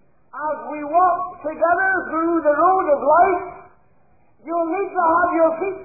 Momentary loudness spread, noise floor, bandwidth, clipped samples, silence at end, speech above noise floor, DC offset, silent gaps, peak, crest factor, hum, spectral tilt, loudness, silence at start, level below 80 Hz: 11 LU; -59 dBFS; 2.6 kHz; under 0.1%; 0 s; 41 dB; 0.2%; none; -4 dBFS; 14 dB; none; -12.5 dB/octave; -19 LUFS; 0.35 s; -56 dBFS